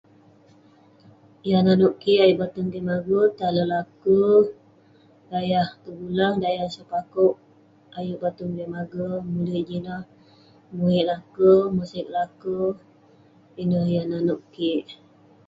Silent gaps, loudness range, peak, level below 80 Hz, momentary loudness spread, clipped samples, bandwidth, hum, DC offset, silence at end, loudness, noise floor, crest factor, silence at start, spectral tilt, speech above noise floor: none; 6 LU; -6 dBFS; -60 dBFS; 14 LU; under 0.1%; 7.6 kHz; none; under 0.1%; 0.55 s; -23 LUFS; -55 dBFS; 18 dB; 1.45 s; -8.5 dB/octave; 33 dB